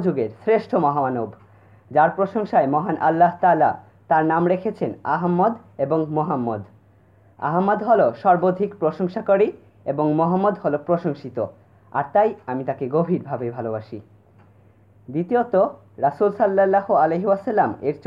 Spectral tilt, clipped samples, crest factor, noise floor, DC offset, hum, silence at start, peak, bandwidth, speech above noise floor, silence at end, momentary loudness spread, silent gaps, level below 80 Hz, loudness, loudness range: -10 dB/octave; under 0.1%; 18 dB; -54 dBFS; under 0.1%; none; 0 s; -4 dBFS; 5.6 kHz; 34 dB; 0.1 s; 11 LU; none; -64 dBFS; -21 LUFS; 5 LU